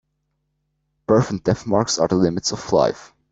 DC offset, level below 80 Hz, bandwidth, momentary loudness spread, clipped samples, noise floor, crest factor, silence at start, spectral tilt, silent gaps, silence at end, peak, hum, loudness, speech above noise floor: under 0.1%; -50 dBFS; 8.2 kHz; 6 LU; under 0.1%; -73 dBFS; 18 dB; 1.1 s; -5 dB/octave; none; 0.25 s; -2 dBFS; none; -20 LUFS; 54 dB